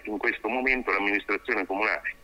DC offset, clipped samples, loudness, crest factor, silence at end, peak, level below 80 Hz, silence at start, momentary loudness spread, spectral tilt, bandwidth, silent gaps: under 0.1%; under 0.1%; -26 LUFS; 18 dB; 0.1 s; -8 dBFS; -52 dBFS; 0.05 s; 4 LU; -4.5 dB/octave; 16 kHz; none